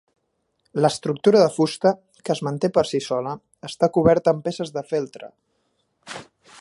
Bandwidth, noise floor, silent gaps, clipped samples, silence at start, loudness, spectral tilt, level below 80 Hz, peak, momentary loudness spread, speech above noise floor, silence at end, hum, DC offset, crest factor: 11.5 kHz; -72 dBFS; none; under 0.1%; 0.75 s; -21 LUFS; -6 dB/octave; -54 dBFS; -2 dBFS; 19 LU; 51 dB; 0.4 s; none; under 0.1%; 20 dB